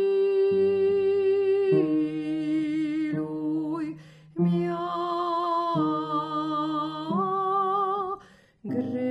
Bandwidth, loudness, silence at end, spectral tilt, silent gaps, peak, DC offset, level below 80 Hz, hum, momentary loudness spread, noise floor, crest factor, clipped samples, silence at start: 7.8 kHz; -26 LUFS; 0 s; -8.5 dB/octave; none; -12 dBFS; under 0.1%; -70 dBFS; none; 8 LU; -52 dBFS; 14 dB; under 0.1%; 0 s